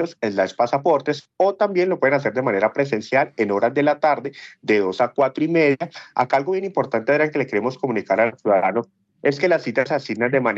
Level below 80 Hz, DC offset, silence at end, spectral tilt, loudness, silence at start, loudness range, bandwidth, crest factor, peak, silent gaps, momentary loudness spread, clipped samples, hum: -74 dBFS; under 0.1%; 0 s; -6.5 dB/octave; -20 LUFS; 0 s; 1 LU; 7.8 kHz; 16 dB; -4 dBFS; none; 6 LU; under 0.1%; none